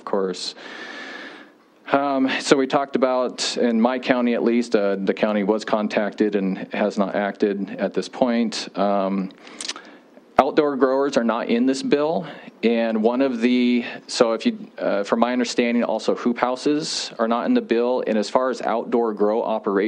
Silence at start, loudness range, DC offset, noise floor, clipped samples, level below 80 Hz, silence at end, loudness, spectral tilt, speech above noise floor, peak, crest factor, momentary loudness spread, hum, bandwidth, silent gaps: 0.05 s; 3 LU; under 0.1%; -48 dBFS; under 0.1%; -68 dBFS; 0 s; -21 LUFS; -4.5 dB/octave; 27 dB; 0 dBFS; 22 dB; 8 LU; none; 10.5 kHz; none